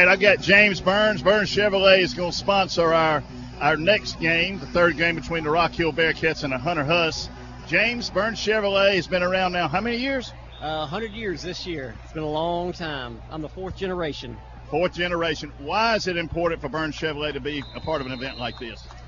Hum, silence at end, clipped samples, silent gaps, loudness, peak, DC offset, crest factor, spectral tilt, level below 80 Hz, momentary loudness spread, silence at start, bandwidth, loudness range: none; 0 s; under 0.1%; none; -22 LUFS; -2 dBFS; under 0.1%; 22 dB; -4.5 dB/octave; -44 dBFS; 14 LU; 0 s; 7.4 kHz; 9 LU